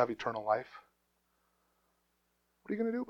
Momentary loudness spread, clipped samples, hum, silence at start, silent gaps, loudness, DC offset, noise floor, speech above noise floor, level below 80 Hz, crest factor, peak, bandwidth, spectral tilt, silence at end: 19 LU; under 0.1%; 60 Hz at -80 dBFS; 0 s; none; -35 LUFS; under 0.1%; -78 dBFS; 44 dB; -76 dBFS; 24 dB; -14 dBFS; 7.6 kHz; -6.5 dB/octave; 0.05 s